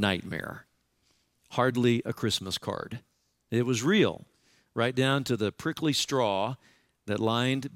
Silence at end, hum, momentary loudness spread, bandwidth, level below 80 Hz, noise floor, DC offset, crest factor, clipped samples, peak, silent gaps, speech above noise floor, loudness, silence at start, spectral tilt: 0 s; none; 16 LU; 16.5 kHz; -64 dBFS; -71 dBFS; under 0.1%; 20 dB; under 0.1%; -8 dBFS; none; 43 dB; -28 LUFS; 0 s; -5 dB/octave